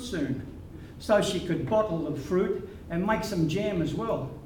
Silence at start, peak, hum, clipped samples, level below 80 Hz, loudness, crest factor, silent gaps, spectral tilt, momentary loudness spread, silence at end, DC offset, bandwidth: 0 s; -10 dBFS; none; under 0.1%; -48 dBFS; -28 LUFS; 18 dB; none; -6 dB/octave; 11 LU; 0 s; under 0.1%; 18.5 kHz